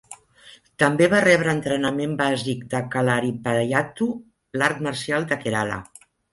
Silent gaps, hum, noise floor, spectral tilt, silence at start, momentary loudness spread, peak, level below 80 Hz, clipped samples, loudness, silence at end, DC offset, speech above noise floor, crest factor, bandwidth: none; none; -46 dBFS; -5.5 dB/octave; 0.1 s; 10 LU; -4 dBFS; -58 dBFS; under 0.1%; -22 LUFS; 0.5 s; under 0.1%; 24 dB; 18 dB; 11.5 kHz